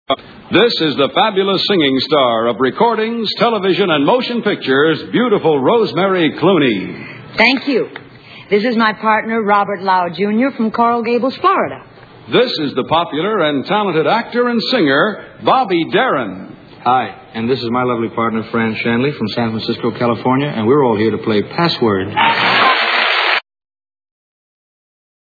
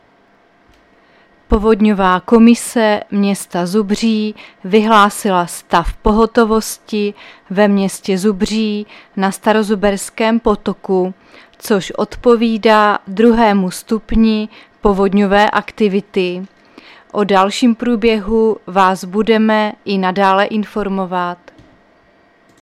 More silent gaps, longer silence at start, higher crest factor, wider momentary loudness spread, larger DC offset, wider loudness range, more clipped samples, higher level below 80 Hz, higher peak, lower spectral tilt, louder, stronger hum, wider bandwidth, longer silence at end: neither; second, 0.1 s vs 1.5 s; about the same, 14 dB vs 14 dB; about the same, 7 LU vs 9 LU; neither; about the same, 3 LU vs 3 LU; neither; second, -56 dBFS vs -34 dBFS; about the same, 0 dBFS vs 0 dBFS; first, -7 dB/octave vs -5.5 dB/octave; about the same, -14 LUFS vs -14 LUFS; neither; second, 5 kHz vs 14.5 kHz; first, 1.8 s vs 1.25 s